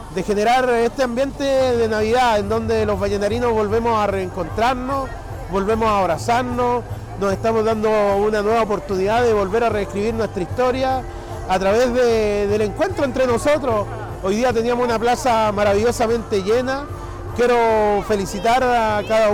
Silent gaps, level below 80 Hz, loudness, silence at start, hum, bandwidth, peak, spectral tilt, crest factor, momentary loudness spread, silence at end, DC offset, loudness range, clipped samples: none; -36 dBFS; -19 LUFS; 0 s; none; 18 kHz; -12 dBFS; -5.5 dB/octave; 6 dB; 8 LU; 0 s; under 0.1%; 2 LU; under 0.1%